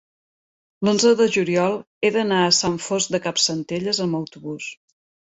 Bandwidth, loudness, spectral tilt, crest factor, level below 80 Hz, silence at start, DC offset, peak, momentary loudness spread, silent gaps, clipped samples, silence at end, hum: 8.4 kHz; -20 LUFS; -3.5 dB/octave; 18 dB; -62 dBFS; 0.8 s; under 0.1%; -4 dBFS; 14 LU; 1.87-2.01 s; under 0.1%; 0.6 s; none